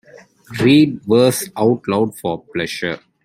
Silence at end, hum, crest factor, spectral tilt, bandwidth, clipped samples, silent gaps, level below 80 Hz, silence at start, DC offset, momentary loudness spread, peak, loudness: 0.25 s; none; 16 dB; -5.5 dB/octave; 15.5 kHz; under 0.1%; none; -54 dBFS; 0.15 s; under 0.1%; 12 LU; 0 dBFS; -17 LUFS